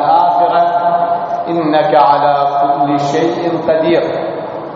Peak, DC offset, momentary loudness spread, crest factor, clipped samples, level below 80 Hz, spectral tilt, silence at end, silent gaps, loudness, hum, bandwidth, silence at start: 0 dBFS; under 0.1%; 7 LU; 12 dB; under 0.1%; -56 dBFS; -4.5 dB/octave; 0 s; none; -13 LUFS; none; 7.6 kHz; 0 s